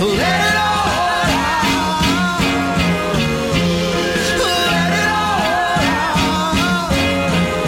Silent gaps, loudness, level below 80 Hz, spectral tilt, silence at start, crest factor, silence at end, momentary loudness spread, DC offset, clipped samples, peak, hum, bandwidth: none; -16 LUFS; -32 dBFS; -4 dB/octave; 0 s; 12 dB; 0 s; 2 LU; under 0.1%; under 0.1%; -4 dBFS; none; 16.5 kHz